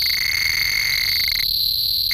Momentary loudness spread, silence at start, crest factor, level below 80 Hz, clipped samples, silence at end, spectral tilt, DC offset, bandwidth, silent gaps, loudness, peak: 0 LU; 0 s; 14 dB; -42 dBFS; under 0.1%; 0 s; 1 dB/octave; under 0.1%; 19 kHz; none; -17 LUFS; -6 dBFS